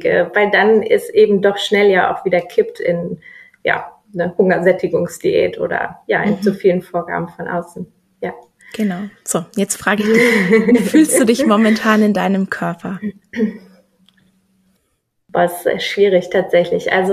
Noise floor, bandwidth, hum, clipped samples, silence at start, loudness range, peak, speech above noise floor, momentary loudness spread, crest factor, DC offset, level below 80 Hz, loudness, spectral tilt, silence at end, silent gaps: -67 dBFS; 14.5 kHz; none; under 0.1%; 0 s; 8 LU; 0 dBFS; 52 dB; 13 LU; 14 dB; under 0.1%; -58 dBFS; -15 LUFS; -5 dB/octave; 0 s; none